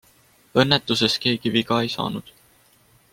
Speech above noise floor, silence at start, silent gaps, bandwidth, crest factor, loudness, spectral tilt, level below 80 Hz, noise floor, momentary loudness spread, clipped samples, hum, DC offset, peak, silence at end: 36 dB; 0.55 s; none; 16.5 kHz; 22 dB; -21 LUFS; -4.5 dB/octave; -58 dBFS; -57 dBFS; 9 LU; under 0.1%; none; under 0.1%; 0 dBFS; 0.9 s